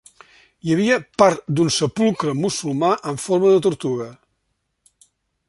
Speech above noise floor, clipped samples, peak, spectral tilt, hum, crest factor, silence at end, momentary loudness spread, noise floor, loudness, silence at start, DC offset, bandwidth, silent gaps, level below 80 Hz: 54 dB; under 0.1%; -2 dBFS; -5 dB/octave; none; 18 dB; 1.35 s; 9 LU; -73 dBFS; -19 LUFS; 0.65 s; under 0.1%; 11.5 kHz; none; -58 dBFS